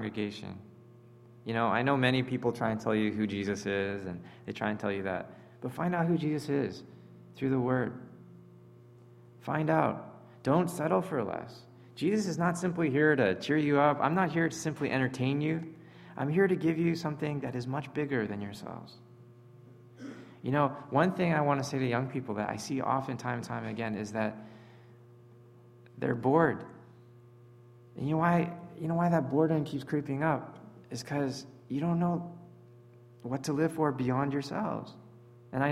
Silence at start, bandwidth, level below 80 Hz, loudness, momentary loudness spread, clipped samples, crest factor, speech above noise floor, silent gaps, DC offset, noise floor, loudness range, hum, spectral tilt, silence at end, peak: 0 s; 13.5 kHz; -68 dBFS; -31 LUFS; 18 LU; under 0.1%; 22 dB; 25 dB; none; under 0.1%; -56 dBFS; 7 LU; none; -6.5 dB/octave; 0 s; -10 dBFS